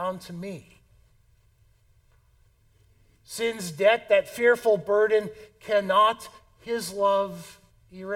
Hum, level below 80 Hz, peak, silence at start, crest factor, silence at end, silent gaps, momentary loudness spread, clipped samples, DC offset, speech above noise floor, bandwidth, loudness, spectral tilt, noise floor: none; -64 dBFS; -6 dBFS; 0 s; 20 dB; 0 s; none; 21 LU; under 0.1%; under 0.1%; 37 dB; 17 kHz; -24 LUFS; -4 dB/octave; -61 dBFS